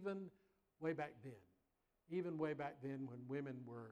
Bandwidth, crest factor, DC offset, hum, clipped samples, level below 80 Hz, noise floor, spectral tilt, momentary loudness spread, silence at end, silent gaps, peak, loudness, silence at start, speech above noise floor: 10 kHz; 18 dB; under 0.1%; none; under 0.1%; -84 dBFS; -85 dBFS; -8.5 dB/octave; 14 LU; 0 s; none; -30 dBFS; -48 LUFS; 0 s; 38 dB